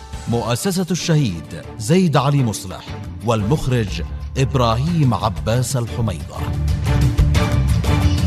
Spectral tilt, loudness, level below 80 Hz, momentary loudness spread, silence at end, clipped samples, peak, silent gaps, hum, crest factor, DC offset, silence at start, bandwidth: -6 dB/octave; -19 LUFS; -26 dBFS; 10 LU; 0 s; under 0.1%; -2 dBFS; none; none; 16 dB; under 0.1%; 0 s; 14 kHz